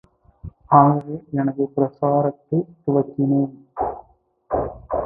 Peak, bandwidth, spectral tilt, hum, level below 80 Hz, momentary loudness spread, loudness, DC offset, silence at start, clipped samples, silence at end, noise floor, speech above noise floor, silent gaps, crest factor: 0 dBFS; 2.5 kHz; -14 dB/octave; none; -48 dBFS; 13 LU; -21 LUFS; under 0.1%; 0.45 s; under 0.1%; 0 s; -56 dBFS; 37 dB; none; 20 dB